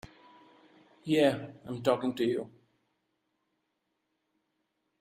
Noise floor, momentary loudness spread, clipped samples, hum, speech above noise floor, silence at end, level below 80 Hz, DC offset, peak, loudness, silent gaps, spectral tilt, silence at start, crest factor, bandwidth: -81 dBFS; 16 LU; under 0.1%; none; 52 dB; 2.55 s; -72 dBFS; under 0.1%; -12 dBFS; -30 LUFS; none; -6 dB/octave; 1.05 s; 22 dB; 15 kHz